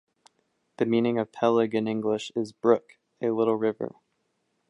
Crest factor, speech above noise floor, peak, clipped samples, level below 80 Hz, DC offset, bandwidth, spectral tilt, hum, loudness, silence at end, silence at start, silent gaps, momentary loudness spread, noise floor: 22 dB; 50 dB; -6 dBFS; under 0.1%; -72 dBFS; under 0.1%; 10.5 kHz; -6.5 dB/octave; none; -26 LUFS; 0.8 s; 0.8 s; none; 8 LU; -75 dBFS